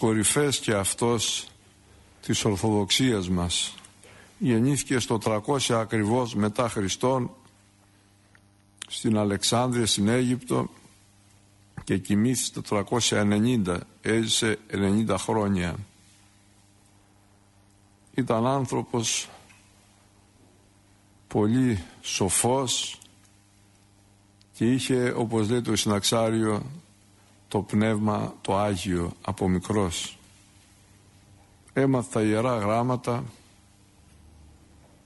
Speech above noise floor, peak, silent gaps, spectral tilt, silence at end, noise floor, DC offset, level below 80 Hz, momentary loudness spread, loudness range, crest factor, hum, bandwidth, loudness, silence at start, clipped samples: 34 dB; -10 dBFS; none; -4.5 dB/octave; 1.75 s; -59 dBFS; under 0.1%; -54 dBFS; 9 LU; 5 LU; 18 dB; none; 11.5 kHz; -25 LUFS; 0 s; under 0.1%